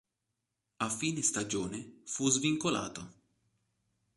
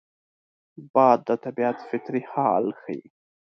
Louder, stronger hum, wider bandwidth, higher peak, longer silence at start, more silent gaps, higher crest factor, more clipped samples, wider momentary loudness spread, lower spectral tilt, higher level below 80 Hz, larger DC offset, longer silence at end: second, -32 LUFS vs -24 LUFS; neither; first, 11.5 kHz vs 6.4 kHz; second, -14 dBFS vs -4 dBFS; about the same, 0.8 s vs 0.8 s; second, none vs 0.90-0.94 s; about the same, 22 dB vs 22 dB; neither; about the same, 14 LU vs 15 LU; second, -3 dB/octave vs -8.5 dB/octave; first, -68 dBFS vs -74 dBFS; neither; first, 1.05 s vs 0.4 s